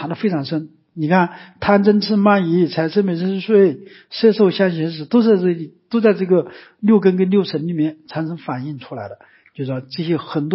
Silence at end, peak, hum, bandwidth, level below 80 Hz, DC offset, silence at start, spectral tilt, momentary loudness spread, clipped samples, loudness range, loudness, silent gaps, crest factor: 0 s; -2 dBFS; none; 5.8 kHz; -58 dBFS; under 0.1%; 0 s; -11.5 dB/octave; 13 LU; under 0.1%; 4 LU; -17 LUFS; none; 16 dB